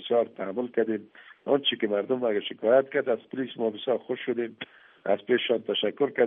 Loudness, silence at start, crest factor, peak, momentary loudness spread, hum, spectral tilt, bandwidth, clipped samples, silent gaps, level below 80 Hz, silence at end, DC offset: -27 LUFS; 0 s; 18 dB; -8 dBFS; 11 LU; none; -2.5 dB/octave; 3.9 kHz; under 0.1%; none; -82 dBFS; 0 s; under 0.1%